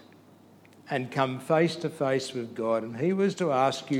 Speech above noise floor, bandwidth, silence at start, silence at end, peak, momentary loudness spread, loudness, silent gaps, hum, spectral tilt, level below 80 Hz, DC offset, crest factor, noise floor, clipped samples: 28 dB; 16 kHz; 0.85 s; 0 s; -10 dBFS; 7 LU; -28 LUFS; none; none; -6 dB/octave; -80 dBFS; under 0.1%; 18 dB; -55 dBFS; under 0.1%